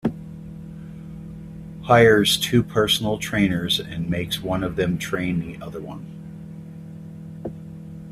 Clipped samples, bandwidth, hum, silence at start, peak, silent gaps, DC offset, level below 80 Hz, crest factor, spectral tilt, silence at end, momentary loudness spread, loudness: under 0.1%; 16 kHz; none; 0.05 s; 0 dBFS; none; under 0.1%; -46 dBFS; 22 dB; -5 dB/octave; 0 s; 21 LU; -20 LUFS